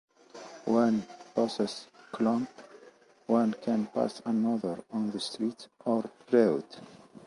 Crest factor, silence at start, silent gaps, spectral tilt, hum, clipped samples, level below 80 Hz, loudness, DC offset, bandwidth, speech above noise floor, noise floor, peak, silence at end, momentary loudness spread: 20 dB; 0.35 s; none; -6 dB/octave; none; under 0.1%; -74 dBFS; -30 LUFS; under 0.1%; 11 kHz; 28 dB; -57 dBFS; -10 dBFS; 0.1 s; 16 LU